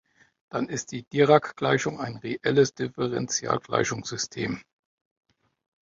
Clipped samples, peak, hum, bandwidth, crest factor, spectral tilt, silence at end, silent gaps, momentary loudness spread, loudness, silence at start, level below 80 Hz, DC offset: under 0.1%; -6 dBFS; none; 7.6 kHz; 22 dB; -4.5 dB/octave; 1.25 s; 1.07-1.11 s; 12 LU; -26 LUFS; 0.55 s; -62 dBFS; under 0.1%